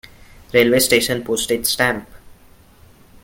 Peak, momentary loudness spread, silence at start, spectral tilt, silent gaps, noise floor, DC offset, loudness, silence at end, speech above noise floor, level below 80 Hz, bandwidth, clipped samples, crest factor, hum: -2 dBFS; 7 LU; 0.55 s; -3 dB/octave; none; -48 dBFS; under 0.1%; -17 LUFS; 0.9 s; 31 dB; -48 dBFS; 17 kHz; under 0.1%; 18 dB; none